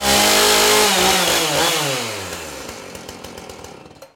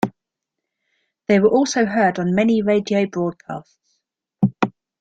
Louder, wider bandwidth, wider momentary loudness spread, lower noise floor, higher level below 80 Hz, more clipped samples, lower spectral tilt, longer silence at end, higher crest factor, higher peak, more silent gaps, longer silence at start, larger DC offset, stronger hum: first, -14 LUFS vs -19 LUFS; first, 17 kHz vs 9 kHz; first, 22 LU vs 15 LU; second, -40 dBFS vs -82 dBFS; first, -44 dBFS vs -58 dBFS; neither; second, -1 dB/octave vs -6 dB/octave; second, 0.1 s vs 0.3 s; about the same, 14 dB vs 18 dB; about the same, -4 dBFS vs -2 dBFS; neither; about the same, 0 s vs 0.05 s; neither; neither